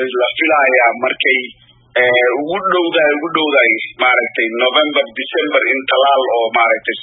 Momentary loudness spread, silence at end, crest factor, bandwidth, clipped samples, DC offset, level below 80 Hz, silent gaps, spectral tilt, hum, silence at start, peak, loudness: 6 LU; 0 s; 14 dB; 4 kHz; under 0.1%; under 0.1%; -64 dBFS; none; -7.5 dB/octave; none; 0 s; 0 dBFS; -13 LUFS